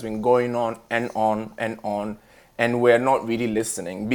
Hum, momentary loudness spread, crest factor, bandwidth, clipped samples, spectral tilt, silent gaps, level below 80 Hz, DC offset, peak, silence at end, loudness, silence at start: none; 11 LU; 20 dB; 19 kHz; under 0.1%; -5 dB/octave; none; -56 dBFS; under 0.1%; -4 dBFS; 0 s; -23 LUFS; 0 s